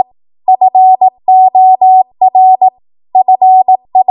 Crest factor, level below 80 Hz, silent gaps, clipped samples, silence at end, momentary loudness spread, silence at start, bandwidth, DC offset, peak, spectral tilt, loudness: 6 dB; -66 dBFS; none; under 0.1%; 0.05 s; 7 LU; 0.5 s; 1.1 kHz; under 0.1%; 0 dBFS; -9.5 dB/octave; -7 LUFS